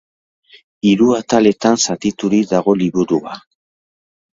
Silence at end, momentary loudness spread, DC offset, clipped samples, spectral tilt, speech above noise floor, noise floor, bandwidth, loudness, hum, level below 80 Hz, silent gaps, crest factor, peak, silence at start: 0.95 s; 7 LU; under 0.1%; under 0.1%; -5 dB/octave; over 76 dB; under -90 dBFS; 7.8 kHz; -15 LUFS; none; -54 dBFS; none; 16 dB; 0 dBFS; 0.85 s